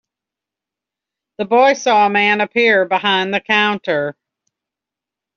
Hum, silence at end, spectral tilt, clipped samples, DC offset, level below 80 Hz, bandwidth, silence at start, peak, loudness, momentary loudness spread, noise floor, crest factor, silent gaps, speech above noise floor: none; 1.25 s; -1 dB/octave; under 0.1%; under 0.1%; -66 dBFS; 7.2 kHz; 1.4 s; -2 dBFS; -14 LUFS; 8 LU; -86 dBFS; 16 dB; none; 71 dB